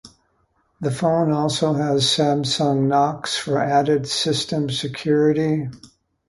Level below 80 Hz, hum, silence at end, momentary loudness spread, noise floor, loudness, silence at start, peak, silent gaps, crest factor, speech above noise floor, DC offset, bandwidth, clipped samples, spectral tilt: -56 dBFS; none; 0.4 s; 7 LU; -65 dBFS; -20 LUFS; 0.05 s; -4 dBFS; none; 16 dB; 45 dB; under 0.1%; 11.5 kHz; under 0.1%; -5 dB/octave